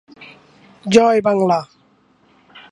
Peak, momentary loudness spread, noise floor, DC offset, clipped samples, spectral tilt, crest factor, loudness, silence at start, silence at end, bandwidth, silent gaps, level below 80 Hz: 0 dBFS; 9 LU; -56 dBFS; under 0.1%; under 0.1%; -5.5 dB/octave; 18 dB; -15 LUFS; 0.2 s; 1.05 s; 11 kHz; none; -60 dBFS